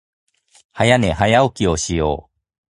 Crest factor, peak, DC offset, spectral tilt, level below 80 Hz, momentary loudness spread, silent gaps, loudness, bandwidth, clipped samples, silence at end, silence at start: 18 dB; 0 dBFS; under 0.1%; -5 dB/octave; -36 dBFS; 7 LU; none; -17 LUFS; 11.5 kHz; under 0.1%; 0.5 s; 0.75 s